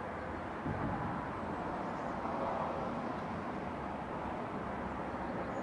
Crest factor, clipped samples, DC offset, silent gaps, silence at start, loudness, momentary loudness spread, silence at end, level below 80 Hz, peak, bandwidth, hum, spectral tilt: 14 dB; under 0.1%; under 0.1%; none; 0 s; -39 LUFS; 4 LU; 0 s; -56 dBFS; -24 dBFS; 11 kHz; none; -7.5 dB/octave